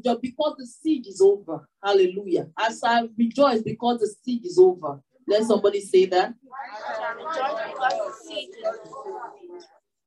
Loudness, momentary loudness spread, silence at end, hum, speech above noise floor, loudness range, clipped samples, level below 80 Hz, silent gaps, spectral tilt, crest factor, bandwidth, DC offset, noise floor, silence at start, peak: -23 LUFS; 17 LU; 0.45 s; none; 27 dB; 8 LU; under 0.1%; -76 dBFS; none; -5 dB/octave; 18 dB; 11 kHz; under 0.1%; -50 dBFS; 0.05 s; -6 dBFS